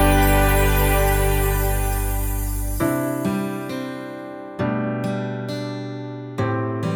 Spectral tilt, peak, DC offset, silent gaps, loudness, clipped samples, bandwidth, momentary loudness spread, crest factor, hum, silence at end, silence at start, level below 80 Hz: -5.5 dB/octave; -6 dBFS; under 0.1%; none; -22 LUFS; under 0.1%; over 20 kHz; 13 LU; 16 dB; none; 0 s; 0 s; -26 dBFS